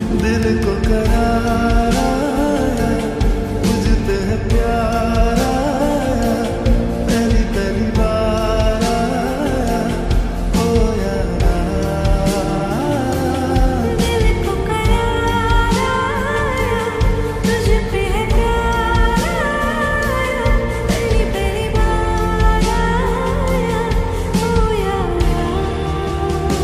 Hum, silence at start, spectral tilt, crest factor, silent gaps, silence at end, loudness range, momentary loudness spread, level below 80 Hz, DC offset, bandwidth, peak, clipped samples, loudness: none; 0 s; -6 dB/octave; 14 dB; none; 0 s; 1 LU; 3 LU; -20 dBFS; under 0.1%; 15 kHz; -2 dBFS; under 0.1%; -17 LUFS